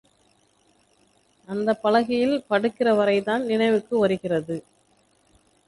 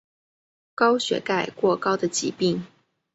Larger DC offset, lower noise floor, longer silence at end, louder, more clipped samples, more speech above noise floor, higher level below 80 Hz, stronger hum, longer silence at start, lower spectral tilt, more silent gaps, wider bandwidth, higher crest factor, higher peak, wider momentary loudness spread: neither; second, -63 dBFS vs under -90 dBFS; first, 1.05 s vs 0.5 s; about the same, -23 LUFS vs -23 LUFS; neither; second, 41 dB vs over 67 dB; about the same, -64 dBFS vs -68 dBFS; first, 50 Hz at -50 dBFS vs none; first, 1.5 s vs 0.8 s; first, -6.5 dB/octave vs -4 dB/octave; neither; first, 11.5 kHz vs 8.2 kHz; about the same, 18 dB vs 18 dB; about the same, -8 dBFS vs -6 dBFS; about the same, 7 LU vs 5 LU